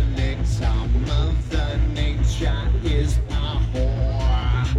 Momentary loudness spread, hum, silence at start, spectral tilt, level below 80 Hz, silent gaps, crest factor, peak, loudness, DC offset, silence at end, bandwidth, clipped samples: 2 LU; none; 0 s; -6.5 dB/octave; -22 dBFS; none; 10 dB; -10 dBFS; -23 LUFS; under 0.1%; 0 s; 9.8 kHz; under 0.1%